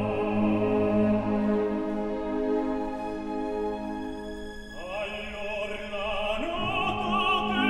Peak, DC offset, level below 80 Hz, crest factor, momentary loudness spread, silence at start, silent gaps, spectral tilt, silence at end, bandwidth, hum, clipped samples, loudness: -14 dBFS; under 0.1%; -46 dBFS; 14 dB; 10 LU; 0 s; none; -6.5 dB/octave; 0 s; 11 kHz; none; under 0.1%; -28 LUFS